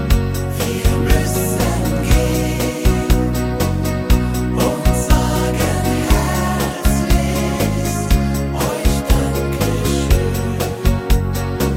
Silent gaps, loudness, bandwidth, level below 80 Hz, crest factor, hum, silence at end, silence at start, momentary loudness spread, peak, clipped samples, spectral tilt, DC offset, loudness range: none; -17 LUFS; 16.5 kHz; -20 dBFS; 14 dB; none; 0 s; 0 s; 4 LU; -2 dBFS; under 0.1%; -5.5 dB/octave; under 0.1%; 1 LU